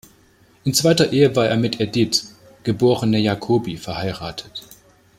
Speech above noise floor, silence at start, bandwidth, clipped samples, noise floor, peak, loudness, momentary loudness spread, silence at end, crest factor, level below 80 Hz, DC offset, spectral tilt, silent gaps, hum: 35 dB; 0.65 s; 16 kHz; under 0.1%; -54 dBFS; -2 dBFS; -19 LUFS; 14 LU; 0.55 s; 18 dB; -52 dBFS; under 0.1%; -5 dB/octave; none; none